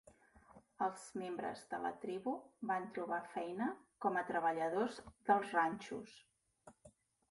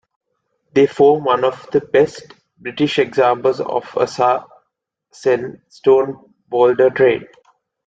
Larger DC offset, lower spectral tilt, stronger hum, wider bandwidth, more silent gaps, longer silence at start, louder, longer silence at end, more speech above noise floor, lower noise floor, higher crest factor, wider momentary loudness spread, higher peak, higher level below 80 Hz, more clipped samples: neither; about the same, -5 dB/octave vs -6 dB/octave; neither; first, 11.5 kHz vs 7.8 kHz; neither; second, 0.5 s vs 0.75 s; second, -40 LUFS vs -16 LUFS; second, 0.4 s vs 0.65 s; second, 27 dB vs 58 dB; second, -67 dBFS vs -73 dBFS; first, 22 dB vs 16 dB; about the same, 10 LU vs 11 LU; second, -20 dBFS vs -2 dBFS; second, -78 dBFS vs -60 dBFS; neither